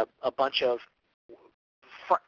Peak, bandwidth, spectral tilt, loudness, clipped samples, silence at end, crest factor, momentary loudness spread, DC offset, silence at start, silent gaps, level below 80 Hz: -8 dBFS; 7.4 kHz; -4 dB/octave; -29 LUFS; under 0.1%; 0.1 s; 24 dB; 10 LU; under 0.1%; 0 s; 1.14-1.29 s, 1.54-1.82 s; -74 dBFS